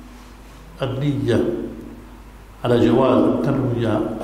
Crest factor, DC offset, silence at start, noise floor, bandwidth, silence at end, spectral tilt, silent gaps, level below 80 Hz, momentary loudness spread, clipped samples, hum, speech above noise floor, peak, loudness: 16 dB; under 0.1%; 0 s; -41 dBFS; 15 kHz; 0 s; -8 dB/octave; none; -42 dBFS; 17 LU; under 0.1%; none; 22 dB; -4 dBFS; -19 LUFS